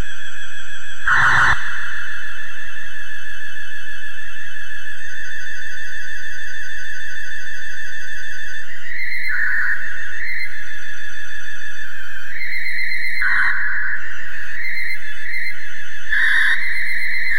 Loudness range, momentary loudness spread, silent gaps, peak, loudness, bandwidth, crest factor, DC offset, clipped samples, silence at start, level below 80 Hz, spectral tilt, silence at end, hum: 9 LU; 14 LU; none; -4 dBFS; -23 LUFS; 16 kHz; 20 dB; 30%; under 0.1%; 0 s; -46 dBFS; -2 dB/octave; 0 s; none